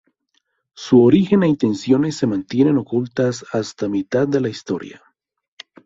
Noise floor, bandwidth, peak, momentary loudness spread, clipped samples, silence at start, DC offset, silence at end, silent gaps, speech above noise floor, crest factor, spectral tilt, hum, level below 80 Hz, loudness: -68 dBFS; 7.8 kHz; -2 dBFS; 13 LU; under 0.1%; 0.8 s; under 0.1%; 0.95 s; none; 51 dB; 16 dB; -7 dB/octave; none; -56 dBFS; -18 LUFS